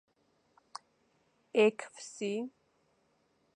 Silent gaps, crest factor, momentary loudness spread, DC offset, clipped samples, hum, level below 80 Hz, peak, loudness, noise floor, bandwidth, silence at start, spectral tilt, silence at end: none; 24 dB; 23 LU; under 0.1%; under 0.1%; none; -88 dBFS; -14 dBFS; -32 LUFS; -74 dBFS; 10.5 kHz; 1.55 s; -4.5 dB/octave; 1.05 s